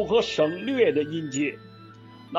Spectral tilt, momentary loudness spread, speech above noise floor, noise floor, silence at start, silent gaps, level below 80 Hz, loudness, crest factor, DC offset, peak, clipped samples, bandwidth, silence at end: -4.5 dB/octave; 7 LU; 22 dB; -47 dBFS; 0 s; none; -58 dBFS; -25 LUFS; 16 dB; under 0.1%; -8 dBFS; under 0.1%; 7.8 kHz; 0 s